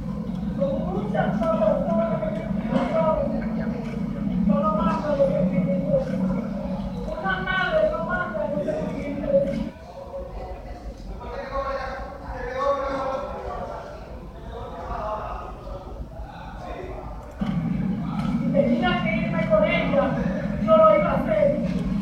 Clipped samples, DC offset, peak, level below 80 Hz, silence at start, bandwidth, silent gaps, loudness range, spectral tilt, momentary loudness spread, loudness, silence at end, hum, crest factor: under 0.1%; under 0.1%; -6 dBFS; -38 dBFS; 0 s; 9 kHz; none; 11 LU; -8 dB/octave; 16 LU; -24 LUFS; 0 s; none; 18 dB